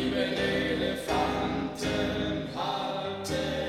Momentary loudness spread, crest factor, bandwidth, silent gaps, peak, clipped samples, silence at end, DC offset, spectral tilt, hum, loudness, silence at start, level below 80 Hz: 4 LU; 14 dB; 15.5 kHz; none; -16 dBFS; under 0.1%; 0 s; under 0.1%; -5 dB/octave; none; -30 LUFS; 0 s; -48 dBFS